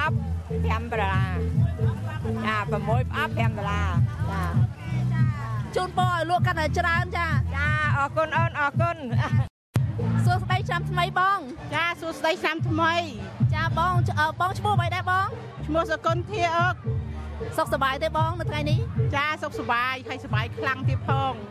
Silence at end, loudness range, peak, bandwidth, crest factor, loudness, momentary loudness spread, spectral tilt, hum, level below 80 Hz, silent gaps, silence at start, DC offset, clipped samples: 0 s; 2 LU; -8 dBFS; 13.5 kHz; 18 dB; -25 LUFS; 5 LU; -6.5 dB/octave; none; -38 dBFS; 9.50-9.73 s; 0 s; under 0.1%; under 0.1%